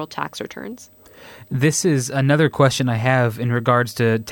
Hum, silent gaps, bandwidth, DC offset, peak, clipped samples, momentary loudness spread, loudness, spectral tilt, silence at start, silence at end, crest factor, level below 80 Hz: none; none; 17 kHz; under 0.1%; -4 dBFS; under 0.1%; 15 LU; -19 LUFS; -5.5 dB/octave; 0 s; 0 s; 14 dB; -56 dBFS